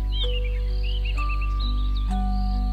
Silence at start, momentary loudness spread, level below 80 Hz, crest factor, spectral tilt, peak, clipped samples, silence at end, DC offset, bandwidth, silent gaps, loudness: 0 s; 2 LU; -24 dBFS; 8 dB; -6.5 dB/octave; -14 dBFS; under 0.1%; 0 s; under 0.1%; 5.2 kHz; none; -27 LUFS